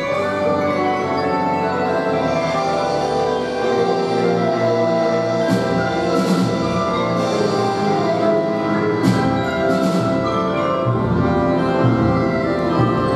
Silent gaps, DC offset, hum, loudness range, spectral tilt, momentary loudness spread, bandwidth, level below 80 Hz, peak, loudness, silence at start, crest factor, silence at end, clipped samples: none; under 0.1%; none; 1 LU; -6.5 dB/octave; 2 LU; 13 kHz; -42 dBFS; -2 dBFS; -18 LUFS; 0 s; 14 dB; 0 s; under 0.1%